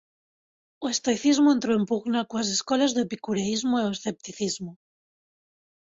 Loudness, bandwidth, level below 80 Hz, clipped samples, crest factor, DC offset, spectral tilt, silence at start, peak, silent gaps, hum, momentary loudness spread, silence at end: -25 LUFS; 8 kHz; -66 dBFS; under 0.1%; 16 dB; under 0.1%; -4 dB/octave; 0.8 s; -10 dBFS; none; none; 12 LU; 1.2 s